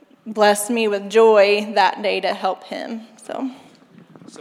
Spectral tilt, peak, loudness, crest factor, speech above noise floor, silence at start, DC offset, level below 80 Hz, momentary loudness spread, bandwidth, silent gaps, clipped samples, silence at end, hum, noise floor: -3 dB/octave; -2 dBFS; -18 LUFS; 16 dB; 29 dB; 0.25 s; under 0.1%; -82 dBFS; 18 LU; 15.5 kHz; none; under 0.1%; 0.85 s; none; -47 dBFS